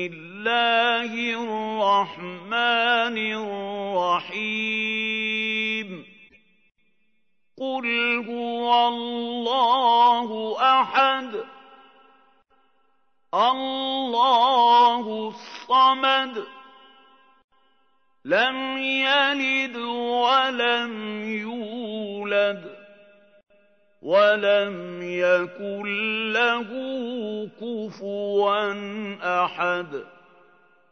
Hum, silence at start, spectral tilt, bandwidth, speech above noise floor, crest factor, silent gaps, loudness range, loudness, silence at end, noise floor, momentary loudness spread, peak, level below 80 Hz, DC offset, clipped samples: none; 0 s; -4 dB/octave; 6.6 kHz; 52 dB; 18 dB; 17.44-17.48 s; 6 LU; -22 LUFS; 0.85 s; -75 dBFS; 14 LU; -6 dBFS; -80 dBFS; under 0.1%; under 0.1%